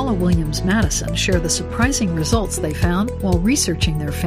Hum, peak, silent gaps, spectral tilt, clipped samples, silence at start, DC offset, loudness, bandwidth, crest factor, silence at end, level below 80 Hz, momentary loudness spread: none; -4 dBFS; none; -4.5 dB/octave; under 0.1%; 0 s; under 0.1%; -19 LUFS; 15.5 kHz; 14 dB; 0 s; -26 dBFS; 3 LU